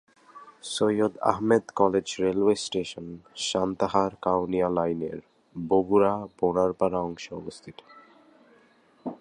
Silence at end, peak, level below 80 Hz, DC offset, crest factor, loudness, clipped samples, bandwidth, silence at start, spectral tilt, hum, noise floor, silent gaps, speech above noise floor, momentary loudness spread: 0.05 s; -4 dBFS; -58 dBFS; under 0.1%; 24 dB; -26 LUFS; under 0.1%; 11 kHz; 0.35 s; -5 dB/octave; none; -60 dBFS; none; 34 dB; 17 LU